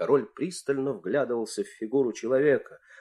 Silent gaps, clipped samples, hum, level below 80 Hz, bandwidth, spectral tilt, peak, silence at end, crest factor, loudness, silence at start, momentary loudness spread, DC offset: none; under 0.1%; none; -74 dBFS; 12 kHz; -5.5 dB/octave; -10 dBFS; 0 s; 18 dB; -28 LUFS; 0 s; 9 LU; under 0.1%